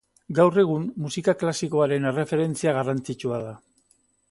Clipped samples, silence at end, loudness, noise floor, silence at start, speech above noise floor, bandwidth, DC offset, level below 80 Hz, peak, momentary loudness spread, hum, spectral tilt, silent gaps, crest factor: under 0.1%; 0.75 s; -24 LUFS; -65 dBFS; 0.3 s; 42 dB; 11.5 kHz; under 0.1%; -64 dBFS; -4 dBFS; 10 LU; none; -6 dB/octave; none; 20 dB